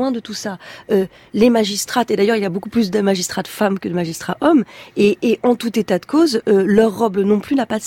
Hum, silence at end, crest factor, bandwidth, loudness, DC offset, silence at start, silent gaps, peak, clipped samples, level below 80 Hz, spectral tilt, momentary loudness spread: none; 0 s; 14 dB; 17 kHz; -17 LUFS; under 0.1%; 0 s; none; -2 dBFS; under 0.1%; -52 dBFS; -5 dB/octave; 9 LU